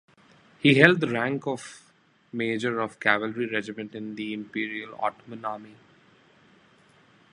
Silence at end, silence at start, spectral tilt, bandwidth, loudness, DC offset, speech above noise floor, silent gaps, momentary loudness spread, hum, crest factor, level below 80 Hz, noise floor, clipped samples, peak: 1.6 s; 0.65 s; -6 dB/octave; 11.5 kHz; -26 LUFS; under 0.1%; 36 dB; none; 18 LU; none; 26 dB; -70 dBFS; -62 dBFS; under 0.1%; 0 dBFS